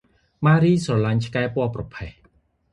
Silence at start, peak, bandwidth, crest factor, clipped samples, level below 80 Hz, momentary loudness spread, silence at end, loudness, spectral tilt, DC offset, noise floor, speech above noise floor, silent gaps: 0.4 s; -4 dBFS; 11 kHz; 18 dB; under 0.1%; -48 dBFS; 18 LU; 0.6 s; -21 LUFS; -7.5 dB/octave; under 0.1%; -61 dBFS; 40 dB; none